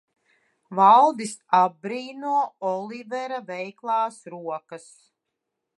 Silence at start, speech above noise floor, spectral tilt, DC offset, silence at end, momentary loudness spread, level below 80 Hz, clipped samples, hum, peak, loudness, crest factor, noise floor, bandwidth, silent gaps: 0.7 s; 59 dB; -4.5 dB/octave; under 0.1%; 1 s; 18 LU; -86 dBFS; under 0.1%; none; -4 dBFS; -23 LUFS; 20 dB; -82 dBFS; 11.5 kHz; none